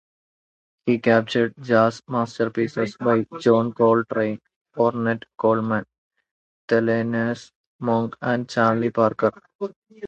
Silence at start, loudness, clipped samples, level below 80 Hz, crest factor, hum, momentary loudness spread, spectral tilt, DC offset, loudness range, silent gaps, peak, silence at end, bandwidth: 0.85 s; -22 LUFS; under 0.1%; -64 dBFS; 20 dB; none; 10 LU; -7 dB/octave; under 0.1%; 3 LU; 4.56-4.65 s, 5.98-6.10 s, 6.31-6.68 s, 7.55-7.79 s, 9.55-9.59 s, 9.76-9.82 s; -4 dBFS; 0 s; 8.2 kHz